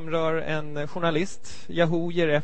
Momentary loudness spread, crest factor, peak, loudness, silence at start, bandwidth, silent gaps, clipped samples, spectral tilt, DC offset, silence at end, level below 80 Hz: 9 LU; 18 dB; -8 dBFS; -27 LUFS; 0 s; 8.8 kHz; none; under 0.1%; -6 dB/octave; 3%; 0 s; -54 dBFS